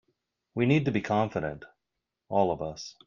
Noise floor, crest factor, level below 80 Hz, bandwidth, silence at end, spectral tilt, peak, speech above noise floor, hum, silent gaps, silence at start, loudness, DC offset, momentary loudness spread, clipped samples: -85 dBFS; 20 dB; -60 dBFS; 7.4 kHz; 0.15 s; -7 dB/octave; -10 dBFS; 58 dB; none; none; 0.55 s; -28 LUFS; under 0.1%; 12 LU; under 0.1%